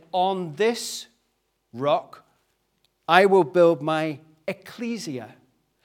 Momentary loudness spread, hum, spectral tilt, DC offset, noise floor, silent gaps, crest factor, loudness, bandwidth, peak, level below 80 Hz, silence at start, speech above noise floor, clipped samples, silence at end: 18 LU; none; -5 dB/octave; under 0.1%; -72 dBFS; none; 24 dB; -23 LUFS; 16.5 kHz; 0 dBFS; -78 dBFS; 0.15 s; 50 dB; under 0.1%; 0.55 s